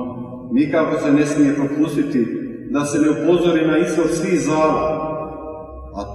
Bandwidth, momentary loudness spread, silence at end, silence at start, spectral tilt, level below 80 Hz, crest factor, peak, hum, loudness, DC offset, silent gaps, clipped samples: 12.5 kHz; 14 LU; 0 s; 0 s; -6 dB/octave; -44 dBFS; 14 dB; -4 dBFS; none; -18 LUFS; under 0.1%; none; under 0.1%